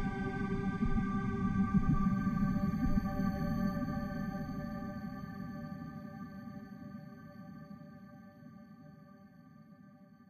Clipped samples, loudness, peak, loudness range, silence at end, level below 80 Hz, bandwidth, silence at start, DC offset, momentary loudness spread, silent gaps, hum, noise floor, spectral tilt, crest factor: under 0.1%; -36 LUFS; -18 dBFS; 18 LU; 0.05 s; -44 dBFS; 13 kHz; 0 s; under 0.1%; 22 LU; none; none; -58 dBFS; -8.5 dB/octave; 18 dB